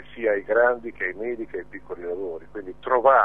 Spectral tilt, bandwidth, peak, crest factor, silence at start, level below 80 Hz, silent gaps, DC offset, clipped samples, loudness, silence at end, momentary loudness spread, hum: -7.5 dB/octave; 3.8 kHz; -4 dBFS; 20 dB; 0.15 s; -56 dBFS; none; 0.6%; under 0.1%; -25 LUFS; 0 s; 15 LU; none